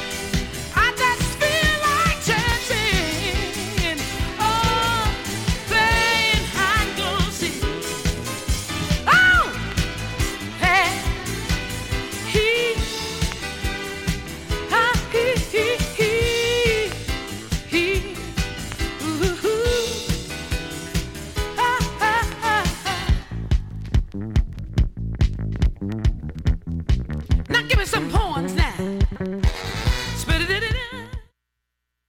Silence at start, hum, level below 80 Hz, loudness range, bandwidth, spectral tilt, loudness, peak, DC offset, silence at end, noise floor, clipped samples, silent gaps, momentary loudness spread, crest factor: 0 s; none; -28 dBFS; 5 LU; 17.5 kHz; -4 dB/octave; -22 LUFS; -6 dBFS; under 0.1%; 0.85 s; -79 dBFS; under 0.1%; none; 9 LU; 16 dB